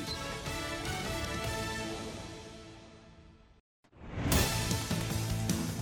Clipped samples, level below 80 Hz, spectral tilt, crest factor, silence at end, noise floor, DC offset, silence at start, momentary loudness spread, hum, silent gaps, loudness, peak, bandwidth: under 0.1%; -46 dBFS; -4 dB/octave; 22 dB; 0 s; -57 dBFS; under 0.1%; 0 s; 21 LU; none; 3.60-3.83 s; -34 LUFS; -14 dBFS; 17 kHz